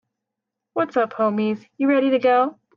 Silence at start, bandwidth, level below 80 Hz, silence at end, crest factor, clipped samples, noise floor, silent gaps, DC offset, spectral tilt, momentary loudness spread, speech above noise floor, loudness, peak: 0.75 s; 6.6 kHz; -72 dBFS; 0.25 s; 14 dB; under 0.1%; -83 dBFS; none; under 0.1%; -7.5 dB/octave; 8 LU; 64 dB; -21 LUFS; -6 dBFS